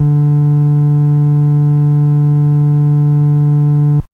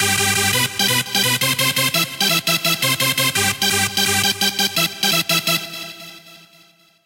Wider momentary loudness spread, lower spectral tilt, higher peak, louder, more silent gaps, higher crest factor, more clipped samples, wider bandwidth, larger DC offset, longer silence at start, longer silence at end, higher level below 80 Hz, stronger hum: second, 0 LU vs 4 LU; first, -12 dB/octave vs -1.5 dB/octave; about the same, -4 dBFS vs -2 dBFS; first, -11 LUFS vs -16 LUFS; neither; second, 6 dB vs 18 dB; neither; second, 2 kHz vs 17 kHz; neither; about the same, 0 s vs 0 s; second, 0.1 s vs 0.7 s; first, -42 dBFS vs -58 dBFS; neither